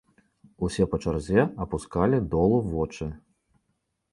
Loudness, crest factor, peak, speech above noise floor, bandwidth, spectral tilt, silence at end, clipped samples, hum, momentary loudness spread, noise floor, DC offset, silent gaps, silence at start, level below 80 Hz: -26 LUFS; 20 dB; -8 dBFS; 51 dB; 11.5 kHz; -7.5 dB/octave; 0.95 s; under 0.1%; none; 10 LU; -76 dBFS; under 0.1%; none; 0.6 s; -42 dBFS